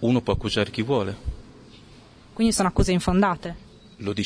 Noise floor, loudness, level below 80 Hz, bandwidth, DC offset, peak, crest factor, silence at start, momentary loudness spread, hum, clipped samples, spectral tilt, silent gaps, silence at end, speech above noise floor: -49 dBFS; -23 LUFS; -36 dBFS; 11 kHz; under 0.1%; -4 dBFS; 20 dB; 0 s; 16 LU; none; under 0.1%; -5.5 dB/octave; none; 0 s; 26 dB